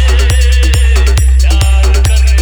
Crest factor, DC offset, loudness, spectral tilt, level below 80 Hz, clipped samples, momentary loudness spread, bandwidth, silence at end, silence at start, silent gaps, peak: 6 dB; under 0.1%; -9 LUFS; -4 dB/octave; -6 dBFS; under 0.1%; 0 LU; 17.5 kHz; 0 s; 0 s; none; 0 dBFS